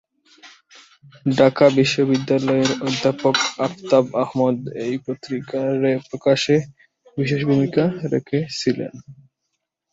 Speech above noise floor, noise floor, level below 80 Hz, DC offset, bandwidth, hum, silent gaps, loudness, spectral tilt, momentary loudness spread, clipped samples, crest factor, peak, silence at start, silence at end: 58 dB; -77 dBFS; -60 dBFS; under 0.1%; 7.8 kHz; none; none; -20 LUFS; -5.5 dB/octave; 10 LU; under 0.1%; 18 dB; -2 dBFS; 0.45 s; 0.8 s